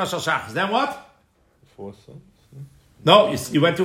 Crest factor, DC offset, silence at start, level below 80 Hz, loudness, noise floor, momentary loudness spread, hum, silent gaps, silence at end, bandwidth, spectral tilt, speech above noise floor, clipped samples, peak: 22 dB; under 0.1%; 0 s; -62 dBFS; -19 LUFS; -61 dBFS; 24 LU; none; none; 0 s; 16 kHz; -4.5 dB/octave; 41 dB; under 0.1%; 0 dBFS